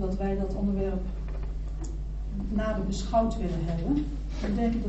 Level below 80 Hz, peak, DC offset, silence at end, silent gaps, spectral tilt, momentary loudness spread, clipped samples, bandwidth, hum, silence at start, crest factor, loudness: -32 dBFS; -14 dBFS; under 0.1%; 0 s; none; -7.5 dB/octave; 10 LU; under 0.1%; 8 kHz; none; 0 s; 16 dB; -31 LUFS